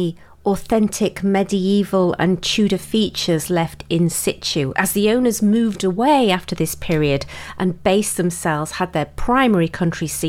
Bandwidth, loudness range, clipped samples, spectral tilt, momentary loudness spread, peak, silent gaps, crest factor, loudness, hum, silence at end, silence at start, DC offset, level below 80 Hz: 16.5 kHz; 2 LU; under 0.1%; -5 dB/octave; 7 LU; -2 dBFS; none; 16 dB; -19 LUFS; none; 0 s; 0 s; under 0.1%; -40 dBFS